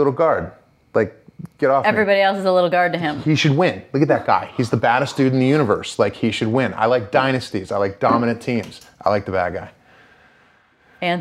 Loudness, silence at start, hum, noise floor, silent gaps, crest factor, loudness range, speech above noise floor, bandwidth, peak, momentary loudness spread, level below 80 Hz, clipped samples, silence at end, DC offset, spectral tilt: -19 LUFS; 0 s; none; -55 dBFS; none; 18 dB; 5 LU; 37 dB; 13 kHz; -2 dBFS; 8 LU; -58 dBFS; under 0.1%; 0 s; under 0.1%; -6.5 dB/octave